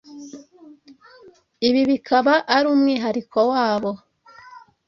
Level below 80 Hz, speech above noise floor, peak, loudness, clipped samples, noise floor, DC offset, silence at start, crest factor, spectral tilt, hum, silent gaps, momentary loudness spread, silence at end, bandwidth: -64 dBFS; 31 dB; -2 dBFS; -19 LUFS; under 0.1%; -50 dBFS; under 0.1%; 0.1 s; 18 dB; -5 dB/octave; none; none; 20 LU; 0.3 s; 6.8 kHz